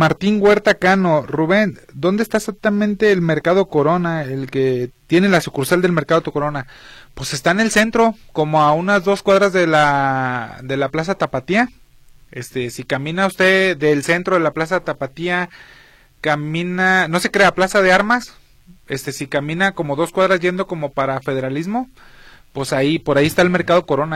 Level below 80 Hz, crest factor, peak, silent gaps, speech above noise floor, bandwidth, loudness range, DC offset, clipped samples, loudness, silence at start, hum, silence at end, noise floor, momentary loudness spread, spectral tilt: -48 dBFS; 16 dB; -2 dBFS; none; 29 dB; 16 kHz; 4 LU; under 0.1%; under 0.1%; -17 LUFS; 0 s; none; 0 s; -46 dBFS; 11 LU; -5.5 dB/octave